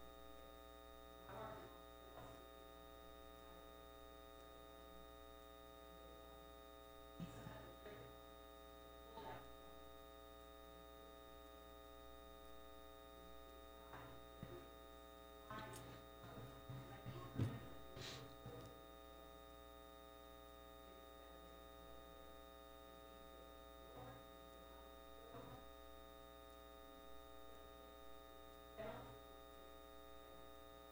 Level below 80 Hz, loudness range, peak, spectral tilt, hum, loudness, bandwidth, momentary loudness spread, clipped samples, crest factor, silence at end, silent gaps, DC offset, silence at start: -68 dBFS; 7 LU; -30 dBFS; -5.5 dB/octave; none; -58 LUFS; 16.5 kHz; 6 LU; under 0.1%; 28 dB; 0 s; none; under 0.1%; 0 s